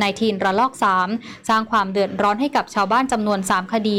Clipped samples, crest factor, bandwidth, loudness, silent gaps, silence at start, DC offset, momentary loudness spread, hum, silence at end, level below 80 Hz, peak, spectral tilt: under 0.1%; 10 dB; 16 kHz; -20 LUFS; none; 0 s; 0.1%; 3 LU; none; 0 s; -54 dBFS; -8 dBFS; -4.5 dB/octave